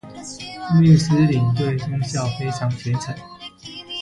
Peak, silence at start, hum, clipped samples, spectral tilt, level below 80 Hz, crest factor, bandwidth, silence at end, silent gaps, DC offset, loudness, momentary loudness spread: -2 dBFS; 0.05 s; none; under 0.1%; -6.5 dB/octave; -50 dBFS; 16 dB; 11 kHz; 0 s; none; under 0.1%; -19 LUFS; 20 LU